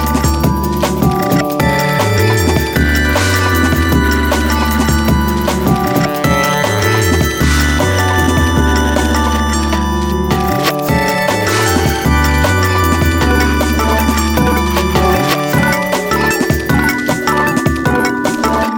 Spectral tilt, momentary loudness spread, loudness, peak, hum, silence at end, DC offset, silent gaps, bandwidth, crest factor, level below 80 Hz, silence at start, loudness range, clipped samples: -5 dB/octave; 2 LU; -13 LUFS; 0 dBFS; none; 0 s; under 0.1%; none; 19 kHz; 12 dB; -20 dBFS; 0 s; 1 LU; under 0.1%